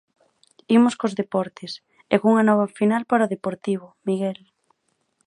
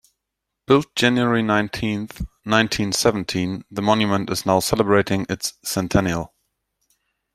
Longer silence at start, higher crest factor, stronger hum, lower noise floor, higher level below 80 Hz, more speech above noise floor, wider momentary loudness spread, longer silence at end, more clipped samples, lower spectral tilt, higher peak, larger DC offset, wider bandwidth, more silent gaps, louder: about the same, 0.7 s vs 0.7 s; about the same, 20 dB vs 20 dB; neither; second, -70 dBFS vs -81 dBFS; second, -70 dBFS vs -44 dBFS; second, 49 dB vs 61 dB; first, 14 LU vs 8 LU; second, 0.95 s vs 1.1 s; neither; first, -6.5 dB/octave vs -4.5 dB/octave; about the same, -2 dBFS vs -2 dBFS; neither; second, 11 kHz vs 16 kHz; neither; about the same, -22 LUFS vs -20 LUFS